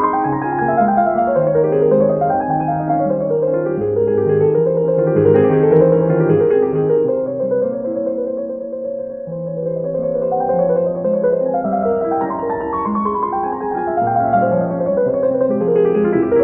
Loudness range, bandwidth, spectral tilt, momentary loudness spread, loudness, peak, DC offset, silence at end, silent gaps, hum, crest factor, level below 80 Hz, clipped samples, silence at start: 6 LU; 3.1 kHz; -13 dB/octave; 8 LU; -16 LUFS; 0 dBFS; under 0.1%; 0 s; none; none; 14 dB; -48 dBFS; under 0.1%; 0 s